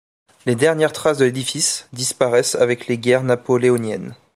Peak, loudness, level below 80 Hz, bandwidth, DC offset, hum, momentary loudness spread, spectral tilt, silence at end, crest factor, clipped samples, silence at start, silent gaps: -2 dBFS; -18 LUFS; -62 dBFS; 15.5 kHz; under 0.1%; none; 7 LU; -4 dB/octave; 0.2 s; 16 dB; under 0.1%; 0.45 s; none